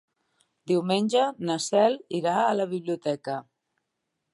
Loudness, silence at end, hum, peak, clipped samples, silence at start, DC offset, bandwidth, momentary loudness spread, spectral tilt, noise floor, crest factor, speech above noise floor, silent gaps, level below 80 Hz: -26 LUFS; 0.9 s; none; -8 dBFS; under 0.1%; 0.65 s; under 0.1%; 11.5 kHz; 8 LU; -5 dB/octave; -81 dBFS; 18 dB; 56 dB; none; -80 dBFS